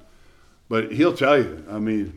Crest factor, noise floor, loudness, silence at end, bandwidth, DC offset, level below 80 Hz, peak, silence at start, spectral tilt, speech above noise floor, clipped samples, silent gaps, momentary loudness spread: 16 dB; -52 dBFS; -21 LUFS; 0 s; 12 kHz; under 0.1%; -52 dBFS; -6 dBFS; 0.7 s; -6.5 dB/octave; 31 dB; under 0.1%; none; 10 LU